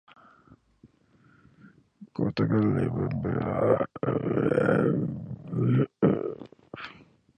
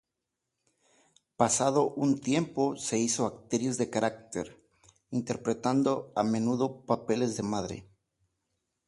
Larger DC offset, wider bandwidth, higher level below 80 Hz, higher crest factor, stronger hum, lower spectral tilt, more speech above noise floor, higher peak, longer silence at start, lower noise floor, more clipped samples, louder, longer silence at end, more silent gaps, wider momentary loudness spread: neither; second, 9.2 kHz vs 11.5 kHz; first, -54 dBFS vs -66 dBFS; about the same, 20 dB vs 20 dB; neither; first, -10 dB/octave vs -5 dB/octave; second, 36 dB vs 57 dB; about the same, -8 dBFS vs -10 dBFS; second, 0.85 s vs 1.4 s; second, -61 dBFS vs -86 dBFS; neither; first, -27 LUFS vs -30 LUFS; second, 0.45 s vs 1.05 s; neither; first, 18 LU vs 9 LU